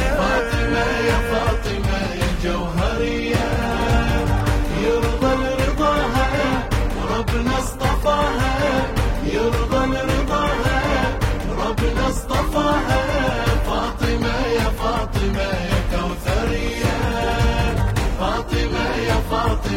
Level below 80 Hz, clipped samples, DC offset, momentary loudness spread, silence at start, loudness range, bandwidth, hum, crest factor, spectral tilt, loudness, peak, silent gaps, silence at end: -24 dBFS; under 0.1%; under 0.1%; 4 LU; 0 s; 2 LU; 16.5 kHz; none; 14 dB; -5.5 dB/octave; -20 LUFS; -4 dBFS; none; 0 s